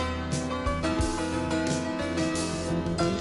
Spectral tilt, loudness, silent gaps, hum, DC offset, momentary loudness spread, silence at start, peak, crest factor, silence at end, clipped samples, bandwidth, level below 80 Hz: -5 dB/octave; -29 LUFS; none; none; under 0.1%; 2 LU; 0 s; -14 dBFS; 14 dB; 0 s; under 0.1%; 11.5 kHz; -38 dBFS